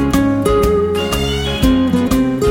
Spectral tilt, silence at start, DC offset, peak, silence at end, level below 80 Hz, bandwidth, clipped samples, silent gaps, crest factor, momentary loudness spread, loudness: -6 dB/octave; 0 s; under 0.1%; -2 dBFS; 0 s; -24 dBFS; 17 kHz; under 0.1%; none; 12 dB; 3 LU; -15 LUFS